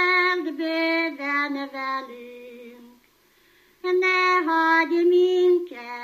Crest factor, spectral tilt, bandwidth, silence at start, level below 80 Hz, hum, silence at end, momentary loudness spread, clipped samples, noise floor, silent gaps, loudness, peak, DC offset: 14 dB; -2.5 dB/octave; 14.5 kHz; 0 s; -76 dBFS; 50 Hz at -80 dBFS; 0 s; 18 LU; under 0.1%; -60 dBFS; none; -21 LUFS; -8 dBFS; under 0.1%